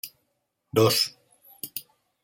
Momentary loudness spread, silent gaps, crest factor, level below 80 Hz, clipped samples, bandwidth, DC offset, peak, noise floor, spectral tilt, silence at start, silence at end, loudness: 19 LU; none; 22 dB; -66 dBFS; under 0.1%; 17 kHz; under 0.1%; -8 dBFS; -76 dBFS; -4 dB/octave; 0.05 s; 0.45 s; -24 LUFS